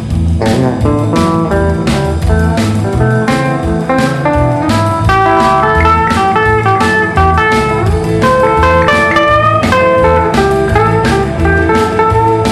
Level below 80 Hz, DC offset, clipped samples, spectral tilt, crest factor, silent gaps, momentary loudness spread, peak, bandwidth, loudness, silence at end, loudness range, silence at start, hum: -22 dBFS; under 0.1%; under 0.1%; -6.5 dB/octave; 10 dB; none; 4 LU; 0 dBFS; 13.5 kHz; -10 LUFS; 0 s; 3 LU; 0 s; none